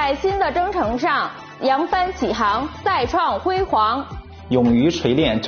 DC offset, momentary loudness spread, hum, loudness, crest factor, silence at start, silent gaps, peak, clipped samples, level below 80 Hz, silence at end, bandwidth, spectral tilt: under 0.1%; 5 LU; none; -19 LUFS; 16 dB; 0 s; none; -4 dBFS; under 0.1%; -40 dBFS; 0 s; 6.8 kHz; -4 dB/octave